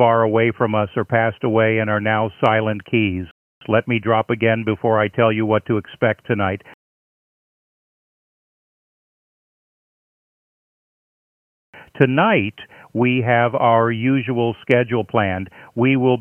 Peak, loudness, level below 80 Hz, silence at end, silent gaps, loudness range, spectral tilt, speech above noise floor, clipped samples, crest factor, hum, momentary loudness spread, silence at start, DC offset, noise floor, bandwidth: 0 dBFS; -18 LUFS; -58 dBFS; 0 s; 3.31-3.61 s, 6.74-11.73 s; 8 LU; -9 dB/octave; over 72 dB; under 0.1%; 20 dB; none; 7 LU; 0 s; under 0.1%; under -90 dBFS; 3.7 kHz